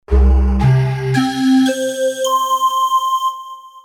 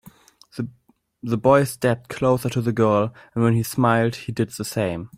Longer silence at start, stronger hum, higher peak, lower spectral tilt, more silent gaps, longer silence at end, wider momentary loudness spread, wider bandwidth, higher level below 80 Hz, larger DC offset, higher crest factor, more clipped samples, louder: about the same, 0.1 s vs 0.05 s; neither; about the same, -2 dBFS vs -4 dBFS; about the same, -6 dB/octave vs -6.5 dB/octave; neither; about the same, 0.05 s vs 0.1 s; second, 5 LU vs 15 LU; about the same, 17.5 kHz vs 16 kHz; first, -20 dBFS vs -54 dBFS; neither; second, 12 dB vs 18 dB; neither; first, -15 LUFS vs -21 LUFS